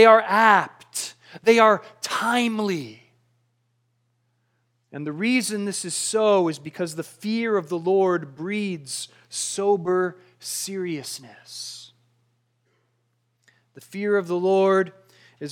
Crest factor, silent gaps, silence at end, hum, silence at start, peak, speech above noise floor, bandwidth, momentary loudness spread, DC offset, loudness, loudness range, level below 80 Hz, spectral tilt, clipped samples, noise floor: 22 dB; none; 0 s; none; 0 s; -2 dBFS; 49 dB; 17 kHz; 18 LU; under 0.1%; -22 LUFS; 9 LU; -82 dBFS; -4 dB/octave; under 0.1%; -71 dBFS